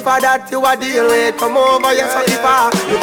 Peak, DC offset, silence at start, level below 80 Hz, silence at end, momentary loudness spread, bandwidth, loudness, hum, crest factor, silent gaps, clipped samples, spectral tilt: -4 dBFS; under 0.1%; 0 s; -50 dBFS; 0 s; 3 LU; 19.5 kHz; -13 LUFS; none; 10 dB; none; under 0.1%; -3 dB/octave